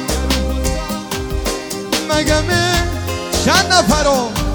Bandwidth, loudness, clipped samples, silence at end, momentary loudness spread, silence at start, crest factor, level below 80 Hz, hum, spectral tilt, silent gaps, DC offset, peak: over 20 kHz; -16 LUFS; under 0.1%; 0 s; 10 LU; 0 s; 16 dB; -24 dBFS; none; -3.5 dB/octave; none; under 0.1%; 0 dBFS